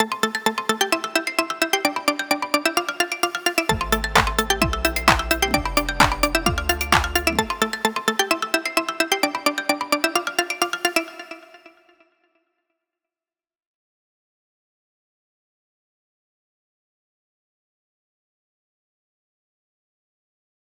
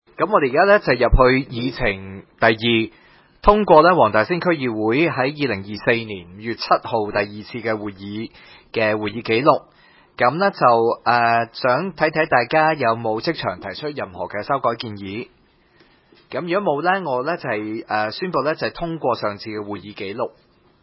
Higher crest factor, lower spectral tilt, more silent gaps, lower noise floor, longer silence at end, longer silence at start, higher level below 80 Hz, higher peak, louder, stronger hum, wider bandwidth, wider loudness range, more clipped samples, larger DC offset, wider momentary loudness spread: about the same, 24 dB vs 20 dB; second, -3 dB/octave vs -9.5 dB/octave; neither; first, under -90 dBFS vs -55 dBFS; first, 9.1 s vs 0.55 s; second, 0 s vs 0.2 s; about the same, -38 dBFS vs -36 dBFS; about the same, 0 dBFS vs 0 dBFS; about the same, -21 LUFS vs -19 LUFS; neither; first, over 20 kHz vs 5.8 kHz; about the same, 6 LU vs 7 LU; neither; neither; second, 5 LU vs 14 LU